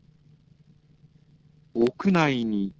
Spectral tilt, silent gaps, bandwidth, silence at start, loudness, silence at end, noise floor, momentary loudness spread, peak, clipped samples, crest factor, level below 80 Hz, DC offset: -7 dB/octave; none; 8 kHz; 1.75 s; -24 LUFS; 0.05 s; -58 dBFS; 6 LU; -6 dBFS; under 0.1%; 22 dB; -62 dBFS; under 0.1%